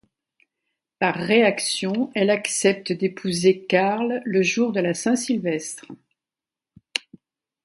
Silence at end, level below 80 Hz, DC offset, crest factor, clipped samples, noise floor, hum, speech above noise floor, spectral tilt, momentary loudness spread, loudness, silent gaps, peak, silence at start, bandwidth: 0.65 s; -68 dBFS; under 0.1%; 20 dB; under 0.1%; -90 dBFS; none; 68 dB; -4 dB/octave; 11 LU; -22 LUFS; none; -2 dBFS; 1 s; 11.5 kHz